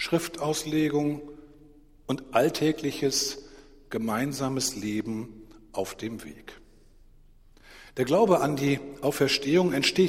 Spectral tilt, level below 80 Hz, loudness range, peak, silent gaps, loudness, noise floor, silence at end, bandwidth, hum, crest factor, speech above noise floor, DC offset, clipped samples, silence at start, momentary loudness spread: -4.5 dB/octave; -56 dBFS; 7 LU; -8 dBFS; none; -27 LUFS; -54 dBFS; 0 s; 16 kHz; none; 20 dB; 28 dB; under 0.1%; under 0.1%; 0 s; 16 LU